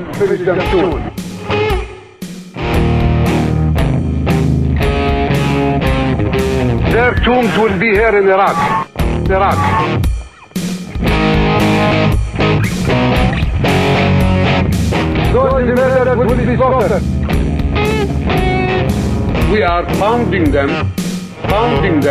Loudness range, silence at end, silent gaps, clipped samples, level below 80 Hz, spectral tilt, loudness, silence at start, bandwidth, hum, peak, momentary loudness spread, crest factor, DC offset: 3 LU; 0 s; none; under 0.1%; -22 dBFS; -6.5 dB/octave; -13 LUFS; 0 s; 15.5 kHz; none; -2 dBFS; 7 LU; 10 dB; under 0.1%